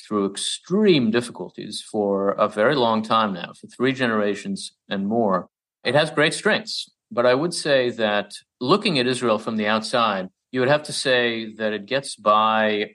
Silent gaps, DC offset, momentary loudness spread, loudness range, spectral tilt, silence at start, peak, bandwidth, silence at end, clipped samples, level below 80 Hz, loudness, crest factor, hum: none; under 0.1%; 11 LU; 2 LU; -4.5 dB/octave; 0.05 s; -4 dBFS; 12 kHz; 0.05 s; under 0.1%; -70 dBFS; -21 LUFS; 18 dB; none